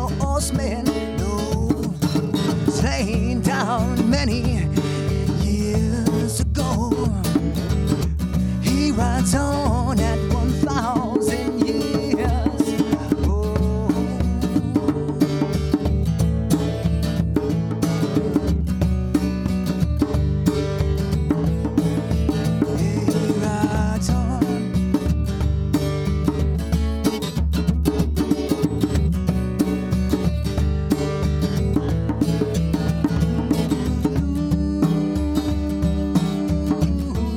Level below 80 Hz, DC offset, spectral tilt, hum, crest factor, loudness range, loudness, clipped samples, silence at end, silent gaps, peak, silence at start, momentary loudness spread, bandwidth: -28 dBFS; under 0.1%; -6.5 dB/octave; none; 16 dB; 1 LU; -21 LUFS; under 0.1%; 0 s; none; -4 dBFS; 0 s; 2 LU; 17 kHz